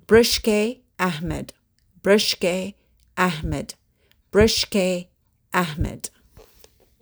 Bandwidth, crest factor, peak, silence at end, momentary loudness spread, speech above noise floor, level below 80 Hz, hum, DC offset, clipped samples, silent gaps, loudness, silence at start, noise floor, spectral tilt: over 20 kHz; 20 dB; -4 dBFS; 0.95 s; 17 LU; 42 dB; -40 dBFS; none; under 0.1%; under 0.1%; none; -22 LUFS; 0.1 s; -62 dBFS; -4 dB/octave